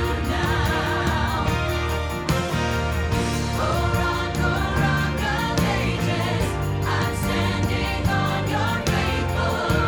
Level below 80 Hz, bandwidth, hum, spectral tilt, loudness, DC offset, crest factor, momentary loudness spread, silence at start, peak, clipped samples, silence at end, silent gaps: -32 dBFS; over 20 kHz; none; -5.5 dB/octave; -23 LUFS; under 0.1%; 16 dB; 2 LU; 0 s; -6 dBFS; under 0.1%; 0 s; none